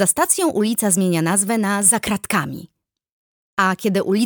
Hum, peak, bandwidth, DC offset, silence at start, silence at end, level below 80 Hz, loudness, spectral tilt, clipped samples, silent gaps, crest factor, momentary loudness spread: none; -2 dBFS; over 20 kHz; under 0.1%; 0 s; 0 s; -56 dBFS; -18 LUFS; -3.5 dB/octave; under 0.1%; 3.12-3.57 s; 16 dB; 7 LU